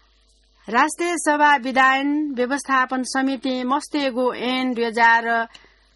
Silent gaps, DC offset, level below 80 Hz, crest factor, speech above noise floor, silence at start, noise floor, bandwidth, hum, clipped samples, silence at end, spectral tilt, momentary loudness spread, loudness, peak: none; under 0.1%; -62 dBFS; 16 dB; 38 dB; 0.65 s; -58 dBFS; 11.5 kHz; none; under 0.1%; 0.5 s; -2.5 dB/octave; 7 LU; -20 LUFS; -4 dBFS